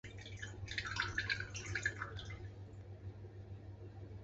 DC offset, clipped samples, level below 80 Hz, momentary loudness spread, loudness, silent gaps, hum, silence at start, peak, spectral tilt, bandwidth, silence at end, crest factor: under 0.1%; under 0.1%; -58 dBFS; 14 LU; -44 LUFS; none; none; 0.05 s; -22 dBFS; -2.5 dB/octave; 8 kHz; 0 s; 22 dB